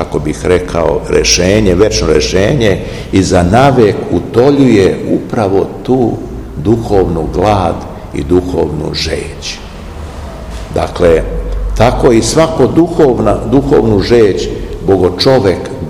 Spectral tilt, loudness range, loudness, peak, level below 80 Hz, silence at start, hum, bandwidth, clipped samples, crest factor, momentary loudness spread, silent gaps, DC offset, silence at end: -5.5 dB/octave; 6 LU; -10 LUFS; 0 dBFS; -24 dBFS; 0 s; none; 17.5 kHz; 2%; 10 dB; 13 LU; none; 0.6%; 0 s